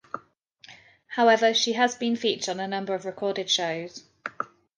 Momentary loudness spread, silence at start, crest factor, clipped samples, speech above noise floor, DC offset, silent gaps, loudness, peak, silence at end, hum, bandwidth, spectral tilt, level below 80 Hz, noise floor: 18 LU; 0.15 s; 18 dB; under 0.1%; 32 dB; under 0.1%; none; -25 LUFS; -8 dBFS; 0.3 s; none; 10.5 kHz; -2.5 dB/octave; -76 dBFS; -56 dBFS